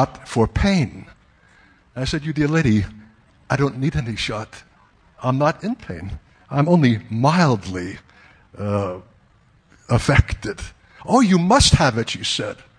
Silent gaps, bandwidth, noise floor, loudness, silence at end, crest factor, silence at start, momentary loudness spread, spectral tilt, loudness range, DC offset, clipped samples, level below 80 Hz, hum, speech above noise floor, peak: none; 10.5 kHz; -56 dBFS; -19 LUFS; 0.25 s; 20 dB; 0 s; 17 LU; -5.5 dB/octave; 6 LU; under 0.1%; under 0.1%; -34 dBFS; none; 37 dB; 0 dBFS